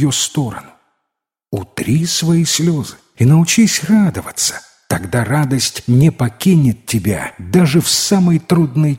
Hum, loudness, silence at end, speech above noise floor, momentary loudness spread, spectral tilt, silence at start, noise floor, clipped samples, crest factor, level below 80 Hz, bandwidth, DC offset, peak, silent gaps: none; -14 LUFS; 0 s; 64 dB; 10 LU; -5 dB/octave; 0 s; -78 dBFS; under 0.1%; 14 dB; -46 dBFS; 16.5 kHz; under 0.1%; 0 dBFS; none